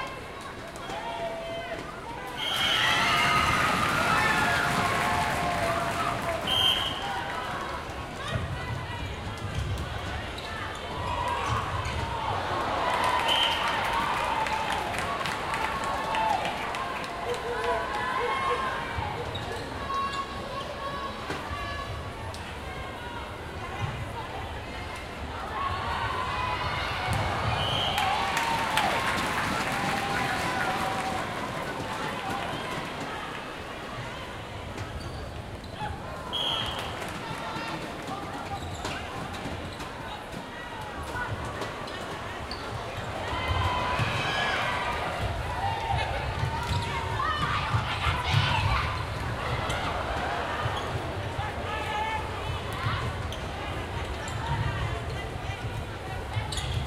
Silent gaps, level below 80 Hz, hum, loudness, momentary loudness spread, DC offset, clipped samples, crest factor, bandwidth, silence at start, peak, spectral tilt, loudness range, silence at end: none; -42 dBFS; none; -29 LUFS; 12 LU; under 0.1%; under 0.1%; 22 dB; 16 kHz; 0 s; -8 dBFS; -4 dB/octave; 10 LU; 0 s